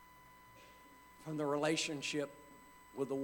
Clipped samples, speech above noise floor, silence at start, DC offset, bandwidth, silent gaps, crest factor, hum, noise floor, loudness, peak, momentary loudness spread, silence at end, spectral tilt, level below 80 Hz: under 0.1%; 23 dB; 0 s; under 0.1%; 19 kHz; none; 18 dB; none; -61 dBFS; -38 LUFS; -22 dBFS; 24 LU; 0 s; -4 dB/octave; -74 dBFS